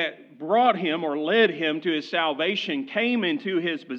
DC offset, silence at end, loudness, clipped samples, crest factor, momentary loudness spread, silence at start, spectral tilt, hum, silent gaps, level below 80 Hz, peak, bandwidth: under 0.1%; 0 s; -24 LUFS; under 0.1%; 18 dB; 6 LU; 0 s; -6 dB/octave; none; none; under -90 dBFS; -6 dBFS; 7.2 kHz